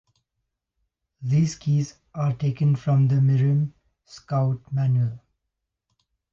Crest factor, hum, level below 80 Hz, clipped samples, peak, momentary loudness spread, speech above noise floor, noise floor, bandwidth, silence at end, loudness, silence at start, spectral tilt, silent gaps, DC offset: 12 dB; none; -60 dBFS; under 0.1%; -12 dBFS; 9 LU; 60 dB; -82 dBFS; 7.4 kHz; 1.15 s; -23 LUFS; 1.2 s; -8 dB/octave; none; under 0.1%